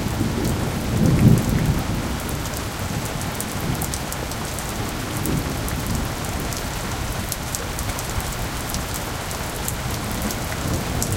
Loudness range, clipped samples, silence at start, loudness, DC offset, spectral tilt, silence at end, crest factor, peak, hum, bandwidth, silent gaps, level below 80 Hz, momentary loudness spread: 5 LU; under 0.1%; 0 s; -24 LUFS; under 0.1%; -4.5 dB/octave; 0 s; 22 dB; 0 dBFS; none; 17 kHz; none; -32 dBFS; 7 LU